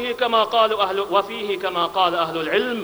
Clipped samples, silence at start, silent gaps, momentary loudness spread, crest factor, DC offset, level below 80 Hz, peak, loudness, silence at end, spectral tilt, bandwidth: under 0.1%; 0 s; none; 5 LU; 16 dB; under 0.1%; -60 dBFS; -4 dBFS; -20 LUFS; 0 s; -4 dB/octave; over 20 kHz